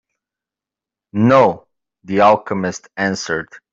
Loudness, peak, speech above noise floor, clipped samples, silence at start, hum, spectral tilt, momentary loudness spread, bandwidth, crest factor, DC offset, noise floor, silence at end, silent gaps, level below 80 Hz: -16 LUFS; -2 dBFS; 72 dB; under 0.1%; 1.15 s; none; -6 dB/octave; 12 LU; 7.8 kHz; 16 dB; under 0.1%; -88 dBFS; 0.15 s; none; -58 dBFS